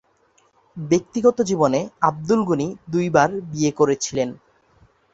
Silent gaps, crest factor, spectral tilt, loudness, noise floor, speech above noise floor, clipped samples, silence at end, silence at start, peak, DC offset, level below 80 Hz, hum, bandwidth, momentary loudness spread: none; 20 dB; -5.5 dB/octave; -20 LUFS; -61 dBFS; 41 dB; under 0.1%; 0.8 s; 0.75 s; -2 dBFS; under 0.1%; -58 dBFS; none; 8 kHz; 7 LU